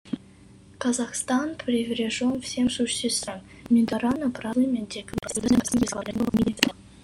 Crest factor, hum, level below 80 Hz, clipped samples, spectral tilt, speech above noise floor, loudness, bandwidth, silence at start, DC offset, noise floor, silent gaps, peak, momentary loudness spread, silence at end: 24 dB; none; -52 dBFS; under 0.1%; -4 dB/octave; 25 dB; -25 LUFS; 16 kHz; 0.05 s; under 0.1%; -50 dBFS; none; -2 dBFS; 8 LU; 0.05 s